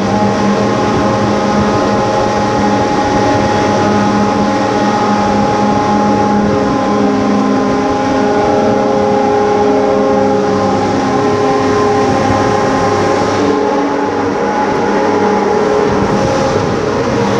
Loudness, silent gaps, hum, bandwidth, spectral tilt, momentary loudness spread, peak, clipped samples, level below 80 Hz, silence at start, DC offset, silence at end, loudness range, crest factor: -12 LUFS; none; none; 10.5 kHz; -6 dB/octave; 2 LU; 0 dBFS; under 0.1%; -36 dBFS; 0 s; under 0.1%; 0 s; 1 LU; 12 dB